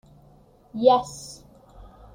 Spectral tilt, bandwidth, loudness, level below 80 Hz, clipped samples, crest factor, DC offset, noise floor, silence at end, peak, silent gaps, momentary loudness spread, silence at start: -5 dB/octave; 15.5 kHz; -21 LUFS; -54 dBFS; under 0.1%; 22 dB; under 0.1%; -54 dBFS; 0.8 s; -4 dBFS; none; 22 LU; 0.75 s